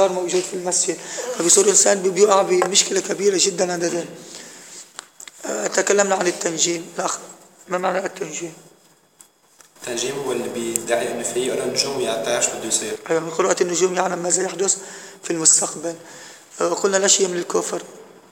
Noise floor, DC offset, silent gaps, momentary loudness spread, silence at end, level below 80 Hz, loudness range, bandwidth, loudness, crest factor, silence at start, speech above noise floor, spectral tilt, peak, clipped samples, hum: -54 dBFS; under 0.1%; none; 20 LU; 0.25 s; -72 dBFS; 10 LU; 17 kHz; -19 LUFS; 22 dB; 0 s; 34 dB; -2 dB/octave; 0 dBFS; under 0.1%; none